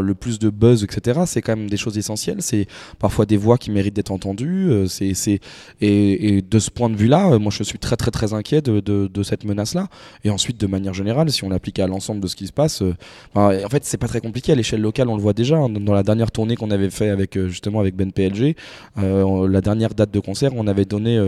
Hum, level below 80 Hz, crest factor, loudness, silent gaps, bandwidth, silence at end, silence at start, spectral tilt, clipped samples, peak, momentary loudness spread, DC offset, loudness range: none; -42 dBFS; 18 dB; -19 LUFS; none; 13.5 kHz; 0 s; 0 s; -6 dB/octave; under 0.1%; 0 dBFS; 8 LU; under 0.1%; 3 LU